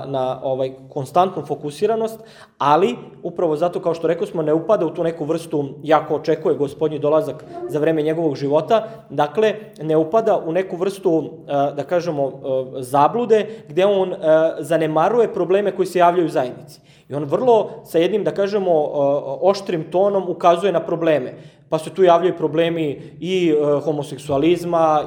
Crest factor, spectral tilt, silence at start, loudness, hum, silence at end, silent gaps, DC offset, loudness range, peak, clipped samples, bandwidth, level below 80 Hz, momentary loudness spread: 18 dB; -6.5 dB/octave; 0 s; -19 LUFS; none; 0 s; none; under 0.1%; 3 LU; 0 dBFS; under 0.1%; 17 kHz; -62 dBFS; 9 LU